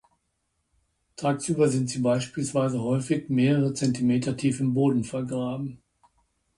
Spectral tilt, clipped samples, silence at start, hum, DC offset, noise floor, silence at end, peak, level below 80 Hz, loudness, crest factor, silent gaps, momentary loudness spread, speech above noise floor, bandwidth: -6.5 dB/octave; under 0.1%; 1.2 s; none; under 0.1%; -76 dBFS; 0.85 s; -10 dBFS; -62 dBFS; -25 LUFS; 16 dB; none; 7 LU; 51 dB; 11.5 kHz